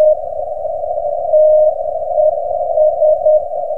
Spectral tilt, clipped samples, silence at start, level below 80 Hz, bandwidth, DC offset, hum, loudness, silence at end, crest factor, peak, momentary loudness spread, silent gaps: -9 dB/octave; under 0.1%; 0 s; -46 dBFS; 1.2 kHz; 3%; none; -14 LUFS; 0 s; 10 dB; -2 dBFS; 10 LU; none